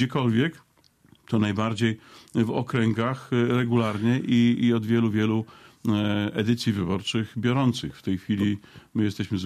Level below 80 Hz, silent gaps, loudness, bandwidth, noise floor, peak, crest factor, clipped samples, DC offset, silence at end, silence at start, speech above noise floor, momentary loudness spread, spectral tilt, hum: -60 dBFS; none; -25 LUFS; 13 kHz; -58 dBFS; -10 dBFS; 14 dB; under 0.1%; under 0.1%; 0 s; 0 s; 34 dB; 8 LU; -7 dB/octave; none